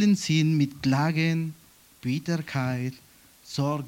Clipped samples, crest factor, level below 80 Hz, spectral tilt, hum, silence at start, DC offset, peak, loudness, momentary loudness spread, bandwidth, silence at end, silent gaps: under 0.1%; 16 dB; -62 dBFS; -6 dB/octave; none; 0 s; under 0.1%; -10 dBFS; -26 LUFS; 13 LU; 17 kHz; 0 s; none